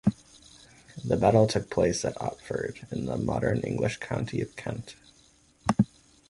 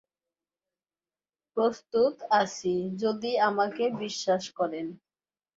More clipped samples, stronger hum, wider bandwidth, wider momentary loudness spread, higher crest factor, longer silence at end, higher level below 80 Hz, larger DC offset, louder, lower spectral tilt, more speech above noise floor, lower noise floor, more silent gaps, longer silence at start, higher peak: neither; neither; first, 11.5 kHz vs 7.8 kHz; first, 14 LU vs 6 LU; about the same, 22 dB vs 20 dB; second, 0.45 s vs 0.65 s; first, -50 dBFS vs -74 dBFS; neither; about the same, -28 LUFS vs -28 LUFS; first, -6 dB/octave vs -4.5 dB/octave; second, 33 dB vs over 62 dB; second, -61 dBFS vs under -90 dBFS; neither; second, 0.05 s vs 1.55 s; about the same, -8 dBFS vs -10 dBFS